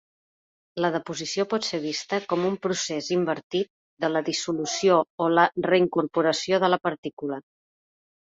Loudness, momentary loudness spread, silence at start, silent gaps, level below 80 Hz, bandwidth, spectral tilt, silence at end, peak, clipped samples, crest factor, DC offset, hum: -25 LUFS; 9 LU; 0.75 s; 3.43-3.50 s, 3.70-3.97 s, 5.10-5.18 s, 6.98-7.03 s, 7.13-7.17 s; -70 dBFS; 8 kHz; -4 dB/octave; 0.85 s; -6 dBFS; under 0.1%; 20 dB; under 0.1%; none